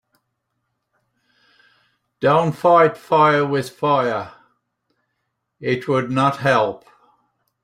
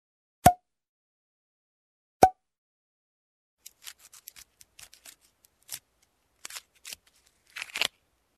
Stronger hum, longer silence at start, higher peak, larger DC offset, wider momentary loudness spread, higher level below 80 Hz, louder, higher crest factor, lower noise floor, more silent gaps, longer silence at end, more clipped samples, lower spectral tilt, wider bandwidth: neither; first, 2.2 s vs 0.45 s; about the same, -2 dBFS vs -2 dBFS; neither; second, 10 LU vs 25 LU; second, -62 dBFS vs -54 dBFS; first, -18 LUFS vs -26 LUFS; second, 18 dB vs 32 dB; first, -75 dBFS vs -71 dBFS; second, none vs 0.89-2.20 s, 2.58-3.57 s; first, 0.85 s vs 0.5 s; neither; first, -6.5 dB/octave vs -3.5 dB/octave; first, 15.5 kHz vs 14 kHz